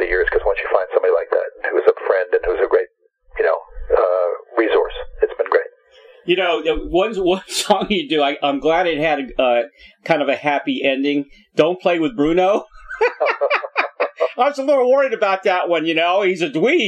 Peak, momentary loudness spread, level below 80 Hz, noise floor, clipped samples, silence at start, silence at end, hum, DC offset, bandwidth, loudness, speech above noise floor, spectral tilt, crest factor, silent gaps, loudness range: -2 dBFS; 5 LU; -42 dBFS; -49 dBFS; under 0.1%; 0 s; 0 s; none; under 0.1%; 15 kHz; -18 LUFS; 32 dB; -4.5 dB/octave; 16 dB; none; 2 LU